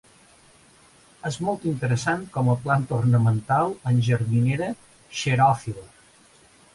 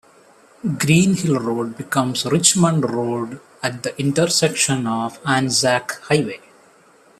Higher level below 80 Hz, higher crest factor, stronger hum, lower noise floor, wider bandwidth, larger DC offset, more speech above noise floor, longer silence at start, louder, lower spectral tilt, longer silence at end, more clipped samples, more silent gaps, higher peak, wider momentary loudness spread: about the same, -56 dBFS vs -58 dBFS; about the same, 16 dB vs 20 dB; neither; about the same, -55 dBFS vs -52 dBFS; second, 11.5 kHz vs 14.5 kHz; neither; about the same, 32 dB vs 33 dB; first, 1.25 s vs 0.65 s; second, -23 LUFS vs -19 LUFS; first, -6.5 dB/octave vs -4 dB/octave; about the same, 0.9 s vs 0.8 s; neither; neither; second, -8 dBFS vs 0 dBFS; about the same, 13 LU vs 11 LU